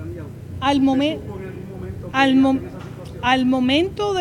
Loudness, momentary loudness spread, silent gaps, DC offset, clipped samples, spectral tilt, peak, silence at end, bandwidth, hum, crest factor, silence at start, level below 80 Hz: -19 LUFS; 17 LU; none; under 0.1%; under 0.1%; -5.5 dB/octave; -4 dBFS; 0 s; 11 kHz; none; 16 dB; 0 s; -46 dBFS